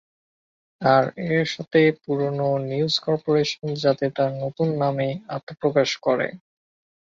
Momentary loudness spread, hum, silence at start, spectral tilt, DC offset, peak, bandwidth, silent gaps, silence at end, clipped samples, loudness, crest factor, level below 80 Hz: 7 LU; none; 0.8 s; -6 dB/octave; under 0.1%; -4 dBFS; 7.8 kHz; 5.43-5.47 s; 0.65 s; under 0.1%; -22 LUFS; 18 dB; -64 dBFS